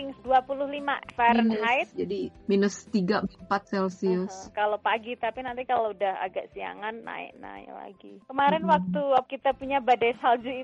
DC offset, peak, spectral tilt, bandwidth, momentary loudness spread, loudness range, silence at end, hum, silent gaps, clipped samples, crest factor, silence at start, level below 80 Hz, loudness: under 0.1%; -10 dBFS; -5.5 dB/octave; 8.2 kHz; 14 LU; 5 LU; 0 s; none; none; under 0.1%; 16 dB; 0 s; -60 dBFS; -27 LUFS